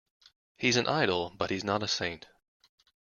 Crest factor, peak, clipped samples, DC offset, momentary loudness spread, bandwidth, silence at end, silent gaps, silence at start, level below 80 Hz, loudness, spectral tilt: 22 dB; -10 dBFS; under 0.1%; under 0.1%; 8 LU; 7.4 kHz; 0.9 s; none; 0.6 s; -64 dBFS; -29 LUFS; -3.5 dB/octave